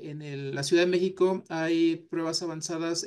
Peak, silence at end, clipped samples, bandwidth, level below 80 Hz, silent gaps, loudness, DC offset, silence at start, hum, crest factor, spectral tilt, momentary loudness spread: -14 dBFS; 0 s; under 0.1%; 12.5 kHz; -76 dBFS; none; -27 LUFS; under 0.1%; 0 s; none; 14 dB; -4.5 dB/octave; 10 LU